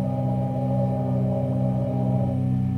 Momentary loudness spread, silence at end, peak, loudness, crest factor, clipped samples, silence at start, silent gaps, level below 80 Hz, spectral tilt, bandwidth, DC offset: 1 LU; 0 s; -12 dBFS; -24 LUFS; 10 dB; under 0.1%; 0 s; none; -46 dBFS; -11 dB/octave; 3.3 kHz; under 0.1%